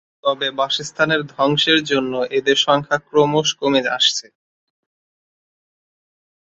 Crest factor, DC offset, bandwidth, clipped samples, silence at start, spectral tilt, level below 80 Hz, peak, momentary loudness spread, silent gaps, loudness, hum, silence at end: 18 dB; under 0.1%; 8 kHz; under 0.1%; 0.25 s; -3.5 dB/octave; -62 dBFS; -2 dBFS; 6 LU; none; -17 LUFS; none; 2.35 s